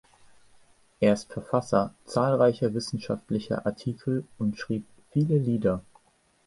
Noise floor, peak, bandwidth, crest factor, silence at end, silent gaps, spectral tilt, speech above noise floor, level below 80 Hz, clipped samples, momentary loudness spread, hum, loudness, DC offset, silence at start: -65 dBFS; -8 dBFS; 11.5 kHz; 20 dB; 0.65 s; none; -7 dB/octave; 38 dB; -58 dBFS; under 0.1%; 9 LU; none; -27 LUFS; under 0.1%; 1 s